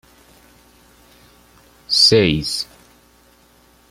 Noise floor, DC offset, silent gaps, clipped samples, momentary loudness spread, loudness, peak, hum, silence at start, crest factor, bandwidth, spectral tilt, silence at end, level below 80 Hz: -53 dBFS; under 0.1%; none; under 0.1%; 14 LU; -14 LUFS; -2 dBFS; 60 Hz at -50 dBFS; 1.9 s; 20 dB; 16 kHz; -3.5 dB/octave; 1.25 s; -48 dBFS